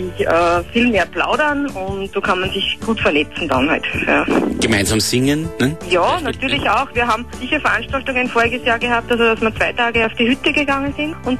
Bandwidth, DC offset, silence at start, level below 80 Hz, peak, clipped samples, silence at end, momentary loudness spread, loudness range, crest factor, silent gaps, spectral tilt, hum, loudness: 13 kHz; 1%; 0 s; -38 dBFS; -2 dBFS; under 0.1%; 0 s; 5 LU; 1 LU; 14 dB; none; -4 dB/octave; none; -16 LUFS